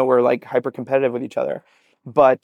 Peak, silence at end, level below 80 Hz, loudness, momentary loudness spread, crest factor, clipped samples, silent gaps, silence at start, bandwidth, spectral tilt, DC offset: -4 dBFS; 0.1 s; -66 dBFS; -20 LUFS; 9 LU; 16 dB; under 0.1%; none; 0 s; 8.6 kHz; -7.5 dB/octave; under 0.1%